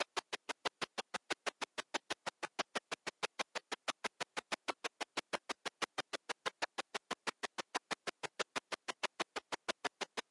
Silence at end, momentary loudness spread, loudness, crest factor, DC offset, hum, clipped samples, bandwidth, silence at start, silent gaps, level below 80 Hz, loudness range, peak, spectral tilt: 0.1 s; 4 LU; -43 LUFS; 22 dB; under 0.1%; none; under 0.1%; 11.5 kHz; 0 s; none; -88 dBFS; 0 LU; -22 dBFS; -1 dB/octave